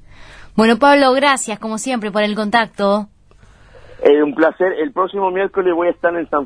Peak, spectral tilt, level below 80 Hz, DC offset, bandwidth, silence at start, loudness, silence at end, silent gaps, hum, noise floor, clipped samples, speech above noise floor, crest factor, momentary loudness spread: 0 dBFS; -4 dB/octave; -50 dBFS; under 0.1%; 11 kHz; 0.2 s; -16 LUFS; 0 s; none; none; -46 dBFS; under 0.1%; 31 dB; 16 dB; 10 LU